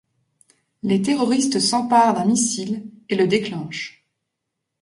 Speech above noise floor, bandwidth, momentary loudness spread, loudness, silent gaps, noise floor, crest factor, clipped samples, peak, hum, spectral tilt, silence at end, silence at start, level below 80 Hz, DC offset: 60 dB; 11.5 kHz; 14 LU; -20 LUFS; none; -80 dBFS; 18 dB; under 0.1%; -4 dBFS; none; -4 dB/octave; 0.95 s; 0.85 s; -64 dBFS; under 0.1%